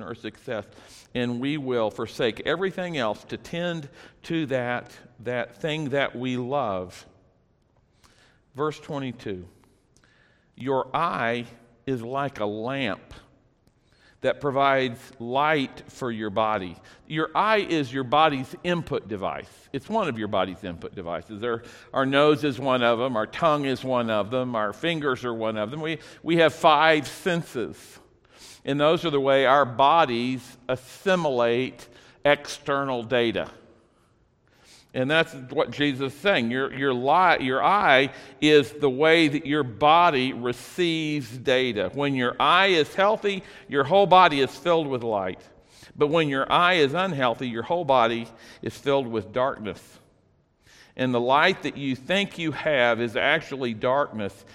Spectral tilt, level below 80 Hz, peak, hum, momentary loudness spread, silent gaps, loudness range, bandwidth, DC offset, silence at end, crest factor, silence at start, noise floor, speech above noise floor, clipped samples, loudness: -5.5 dB/octave; -60 dBFS; -2 dBFS; none; 14 LU; none; 9 LU; 15.5 kHz; under 0.1%; 0.2 s; 22 dB; 0 s; -64 dBFS; 40 dB; under 0.1%; -24 LUFS